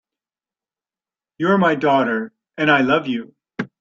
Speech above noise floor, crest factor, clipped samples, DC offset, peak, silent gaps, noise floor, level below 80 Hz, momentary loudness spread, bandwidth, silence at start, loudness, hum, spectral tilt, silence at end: over 73 dB; 18 dB; under 0.1%; under 0.1%; -2 dBFS; none; under -90 dBFS; -62 dBFS; 15 LU; 7.4 kHz; 1.4 s; -18 LUFS; none; -7 dB/octave; 0.15 s